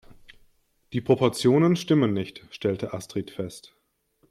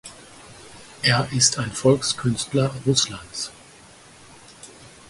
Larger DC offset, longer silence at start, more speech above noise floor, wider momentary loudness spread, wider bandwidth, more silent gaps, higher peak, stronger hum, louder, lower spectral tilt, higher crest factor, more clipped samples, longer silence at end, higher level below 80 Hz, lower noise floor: neither; about the same, 0.1 s vs 0.05 s; first, 43 dB vs 26 dB; second, 15 LU vs 24 LU; first, 14 kHz vs 11.5 kHz; neither; about the same, -6 dBFS vs -4 dBFS; neither; second, -25 LUFS vs -21 LUFS; first, -6.5 dB/octave vs -3.5 dB/octave; about the same, 20 dB vs 22 dB; neither; first, 0.7 s vs 0.2 s; second, -60 dBFS vs -54 dBFS; first, -67 dBFS vs -48 dBFS